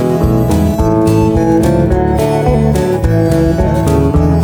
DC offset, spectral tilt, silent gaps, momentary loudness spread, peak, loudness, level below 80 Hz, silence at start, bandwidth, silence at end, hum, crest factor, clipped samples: under 0.1%; -8 dB/octave; none; 2 LU; 0 dBFS; -11 LUFS; -20 dBFS; 0 s; 20 kHz; 0 s; none; 10 dB; under 0.1%